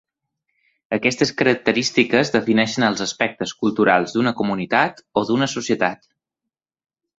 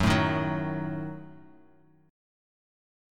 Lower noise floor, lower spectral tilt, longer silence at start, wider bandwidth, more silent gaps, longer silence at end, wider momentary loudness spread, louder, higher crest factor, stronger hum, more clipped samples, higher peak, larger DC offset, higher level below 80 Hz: first, -85 dBFS vs -60 dBFS; second, -4.5 dB/octave vs -6 dB/octave; first, 0.9 s vs 0 s; second, 8 kHz vs 16.5 kHz; neither; second, 1.25 s vs 1.7 s; second, 6 LU vs 19 LU; first, -19 LUFS vs -29 LUFS; about the same, 20 dB vs 20 dB; neither; neither; first, -2 dBFS vs -12 dBFS; neither; second, -60 dBFS vs -48 dBFS